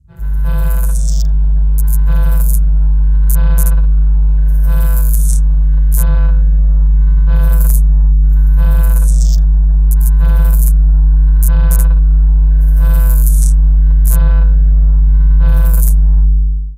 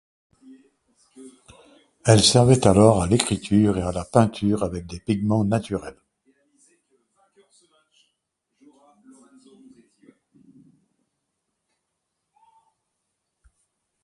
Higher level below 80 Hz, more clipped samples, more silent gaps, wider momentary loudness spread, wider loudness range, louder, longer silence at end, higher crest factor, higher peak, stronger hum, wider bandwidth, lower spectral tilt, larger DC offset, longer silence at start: first, -8 dBFS vs -46 dBFS; neither; neither; second, 3 LU vs 14 LU; second, 2 LU vs 11 LU; first, -12 LUFS vs -20 LUFS; second, 0 s vs 8.1 s; second, 8 dB vs 24 dB; about the same, 0 dBFS vs 0 dBFS; neither; first, 16 kHz vs 11.5 kHz; about the same, -6.5 dB/octave vs -5.5 dB/octave; neither; second, 0.2 s vs 1.2 s